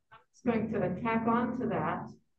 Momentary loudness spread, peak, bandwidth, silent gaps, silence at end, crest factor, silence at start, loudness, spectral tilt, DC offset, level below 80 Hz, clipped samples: 7 LU; -16 dBFS; 6.6 kHz; none; 0.25 s; 16 dB; 0.1 s; -32 LUFS; -8.5 dB/octave; under 0.1%; -60 dBFS; under 0.1%